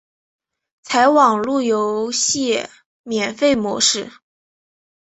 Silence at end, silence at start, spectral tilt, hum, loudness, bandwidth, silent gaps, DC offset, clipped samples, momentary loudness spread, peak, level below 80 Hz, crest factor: 0.95 s; 0.85 s; -2 dB/octave; none; -17 LUFS; 8.4 kHz; 2.86-3.04 s; under 0.1%; under 0.1%; 10 LU; -2 dBFS; -60 dBFS; 18 dB